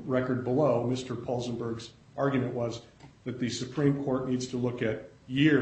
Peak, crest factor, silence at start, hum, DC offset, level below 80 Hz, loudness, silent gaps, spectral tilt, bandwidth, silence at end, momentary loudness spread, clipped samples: -12 dBFS; 18 dB; 0 s; none; under 0.1%; -60 dBFS; -30 LUFS; none; -6.5 dB/octave; 8.4 kHz; 0 s; 13 LU; under 0.1%